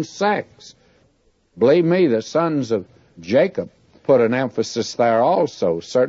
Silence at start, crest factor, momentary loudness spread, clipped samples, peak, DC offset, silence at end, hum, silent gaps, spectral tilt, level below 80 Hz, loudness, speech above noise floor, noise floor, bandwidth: 0 s; 14 dB; 11 LU; under 0.1%; -4 dBFS; under 0.1%; 0 s; none; none; -6 dB/octave; -62 dBFS; -19 LUFS; 43 dB; -61 dBFS; 7.8 kHz